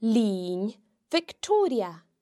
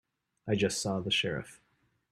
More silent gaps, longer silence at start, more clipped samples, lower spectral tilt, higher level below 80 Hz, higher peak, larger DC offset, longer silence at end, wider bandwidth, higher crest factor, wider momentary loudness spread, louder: neither; second, 0 s vs 0.45 s; neither; first, -5.5 dB/octave vs -4 dB/octave; second, -74 dBFS vs -64 dBFS; first, -12 dBFS vs -16 dBFS; neither; second, 0.25 s vs 0.55 s; second, 12.5 kHz vs 14 kHz; about the same, 14 dB vs 18 dB; second, 9 LU vs 15 LU; first, -27 LUFS vs -31 LUFS